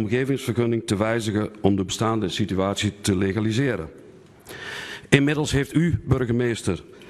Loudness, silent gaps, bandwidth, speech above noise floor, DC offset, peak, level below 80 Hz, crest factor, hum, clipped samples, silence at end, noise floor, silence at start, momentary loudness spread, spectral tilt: -23 LUFS; none; 13.5 kHz; 24 dB; under 0.1%; 0 dBFS; -46 dBFS; 22 dB; none; under 0.1%; 0 s; -47 dBFS; 0 s; 11 LU; -5.5 dB/octave